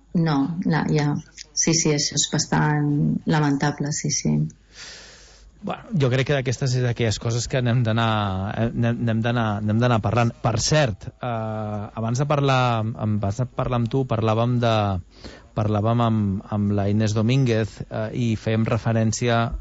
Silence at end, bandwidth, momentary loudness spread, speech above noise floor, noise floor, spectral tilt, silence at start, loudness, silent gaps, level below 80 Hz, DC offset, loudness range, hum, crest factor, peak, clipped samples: 0 s; 8 kHz; 9 LU; 26 dB; -48 dBFS; -5.5 dB/octave; 0.15 s; -22 LUFS; none; -46 dBFS; under 0.1%; 3 LU; none; 14 dB; -8 dBFS; under 0.1%